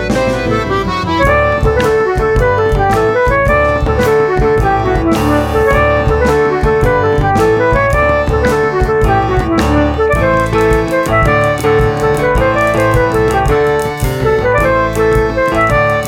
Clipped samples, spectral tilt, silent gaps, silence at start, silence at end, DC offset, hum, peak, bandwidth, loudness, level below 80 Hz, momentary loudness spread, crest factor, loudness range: under 0.1%; -6.5 dB/octave; none; 0 s; 0 s; under 0.1%; none; 0 dBFS; 17 kHz; -12 LUFS; -20 dBFS; 2 LU; 12 dB; 1 LU